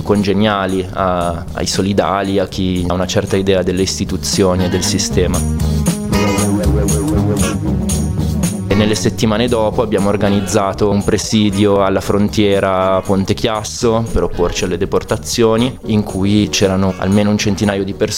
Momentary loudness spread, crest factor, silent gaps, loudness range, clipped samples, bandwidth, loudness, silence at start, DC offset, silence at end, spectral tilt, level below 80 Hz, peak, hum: 4 LU; 14 dB; none; 2 LU; under 0.1%; 16.5 kHz; -15 LUFS; 0 s; under 0.1%; 0 s; -5 dB/octave; -28 dBFS; 0 dBFS; none